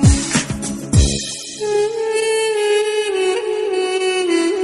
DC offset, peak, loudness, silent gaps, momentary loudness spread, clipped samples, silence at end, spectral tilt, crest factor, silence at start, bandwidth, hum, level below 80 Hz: under 0.1%; 0 dBFS; -18 LUFS; none; 6 LU; under 0.1%; 0 s; -4.5 dB/octave; 16 dB; 0 s; 12 kHz; none; -28 dBFS